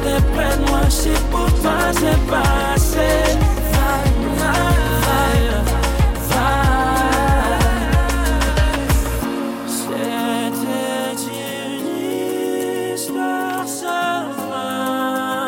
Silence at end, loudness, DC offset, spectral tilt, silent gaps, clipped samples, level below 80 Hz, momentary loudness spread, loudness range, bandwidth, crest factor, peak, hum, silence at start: 0 s; -18 LUFS; under 0.1%; -5 dB/octave; none; under 0.1%; -22 dBFS; 7 LU; 5 LU; 17 kHz; 12 dB; -4 dBFS; none; 0 s